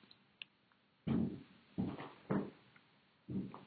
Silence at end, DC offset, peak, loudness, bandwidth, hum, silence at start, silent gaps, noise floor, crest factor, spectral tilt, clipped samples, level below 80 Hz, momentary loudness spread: 0 s; under 0.1%; -24 dBFS; -43 LUFS; 4.8 kHz; none; 1.05 s; none; -74 dBFS; 20 dB; -7 dB/octave; under 0.1%; -72 dBFS; 16 LU